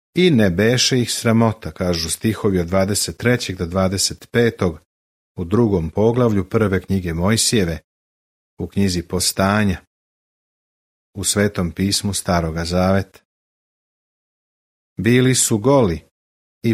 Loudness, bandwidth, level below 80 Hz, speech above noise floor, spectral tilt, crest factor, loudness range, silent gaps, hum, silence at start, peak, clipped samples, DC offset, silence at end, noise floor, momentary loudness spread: -18 LUFS; 16 kHz; -42 dBFS; over 72 dB; -4.5 dB/octave; 18 dB; 4 LU; 4.86-5.35 s, 7.84-8.57 s, 9.87-11.13 s, 13.25-14.96 s, 16.11-16.61 s; none; 0.15 s; -2 dBFS; under 0.1%; under 0.1%; 0 s; under -90 dBFS; 9 LU